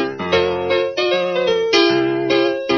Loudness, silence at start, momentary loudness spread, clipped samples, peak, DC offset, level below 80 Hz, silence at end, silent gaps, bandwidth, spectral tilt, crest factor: -17 LUFS; 0 s; 4 LU; under 0.1%; 0 dBFS; under 0.1%; -54 dBFS; 0 s; none; 6.8 kHz; -2.5 dB/octave; 16 dB